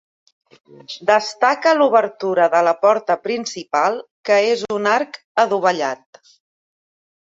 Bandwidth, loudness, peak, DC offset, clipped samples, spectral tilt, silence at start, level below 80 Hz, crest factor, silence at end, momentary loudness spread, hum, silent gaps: 7.8 kHz; -18 LUFS; 0 dBFS; under 0.1%; under 0.1%; -3.5 dB/octave; 0.9 s; -70 dBFS; 18 dB; 1.3 s; 9 LU; none; 4.11-4.24 s, 5.24-5.35 s